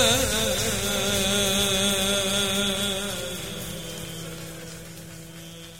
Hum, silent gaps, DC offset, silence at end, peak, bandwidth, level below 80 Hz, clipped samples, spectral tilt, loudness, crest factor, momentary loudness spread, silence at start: none; none; 0.6%; 0 s; -6 dBFS; 16.5 kHz; -44 dBFS; under 0.1%; -2.5 dB/octave; -23 LUFS; 20 dB; 19 LU; 0 s